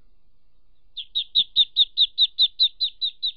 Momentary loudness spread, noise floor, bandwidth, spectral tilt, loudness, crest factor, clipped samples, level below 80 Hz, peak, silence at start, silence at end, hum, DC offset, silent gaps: 10 LU; -65 dBFS; 5.4 kHz; -1 dB/octave; -19 LUFS; 16 dB; under 0.1%; -62 dBFS; -8 dBFS; 0.95 s; 0.05 s; none; 0.5%; none